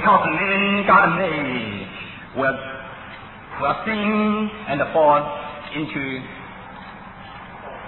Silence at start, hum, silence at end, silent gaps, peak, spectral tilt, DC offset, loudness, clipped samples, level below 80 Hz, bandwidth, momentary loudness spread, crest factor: 0 s; none; 0 s; none; -2 dBFS; -9.5 dB/octave; under 0.1%; -20 LUFS; under 0.1%; -50 dBFS; 4.2 kHz; 21 LU; 20 dB